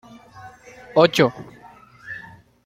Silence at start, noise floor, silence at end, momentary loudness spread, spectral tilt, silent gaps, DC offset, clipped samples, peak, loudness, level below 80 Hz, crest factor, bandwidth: 0.45 s; -47 dBFS; 0.45 s; 26 LU; -5.5 dB/octave; none; under 0.1%; under 0.1%; -2 dBFS; -18 LUFS; -60 dBFS; 22 dB; 16 kHz